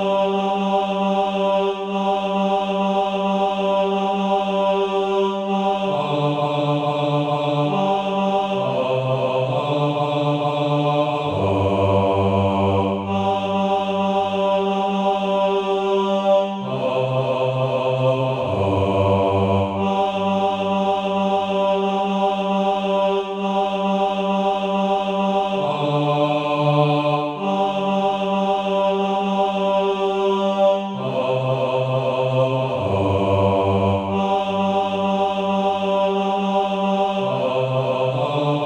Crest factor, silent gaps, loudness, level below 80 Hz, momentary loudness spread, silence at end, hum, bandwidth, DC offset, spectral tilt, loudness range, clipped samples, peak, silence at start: 14 dB; none; -20 LUFS; -56 dBFS; 3 LU; 0 s; none; 9.4 kHz; under 0.1%; -7 dB/octave; 1 LU; under 0.1%; -6 dBFS; 0 s